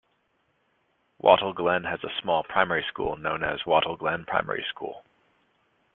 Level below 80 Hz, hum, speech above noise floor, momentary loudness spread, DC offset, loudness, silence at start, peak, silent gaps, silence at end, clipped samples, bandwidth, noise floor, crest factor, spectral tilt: -58 dBFS; none; 45 dB; 10 LU; under 0.1%; -26 LUFS; 1.25 s; -2 dBFS; none; 0.95 s; under 0.1%; 4.1 kHz; -71 dBFS; 24 dB; -8 dB/octave